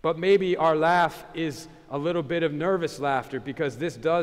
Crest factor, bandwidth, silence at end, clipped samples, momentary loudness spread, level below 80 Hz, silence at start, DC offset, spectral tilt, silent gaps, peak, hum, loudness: 14 dB; 15 kHz; 0 s; under 0.1%; 11 LU; -58 dBFS; 0.05 s; under 0.1%; -6 dB/octave; none; -10 dBFS; none; -25 LUFS